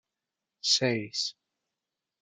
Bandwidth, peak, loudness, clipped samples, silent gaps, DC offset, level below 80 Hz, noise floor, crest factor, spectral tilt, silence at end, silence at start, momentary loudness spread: 12 kHz; -12 dBFS; -28 LUFS; under 0.1%; none; under 0.1%; -84 dBFS; -88 dBFS; 20 dB; -2.5 dB/octave; 0.9 s; 0.65 s; 9 LU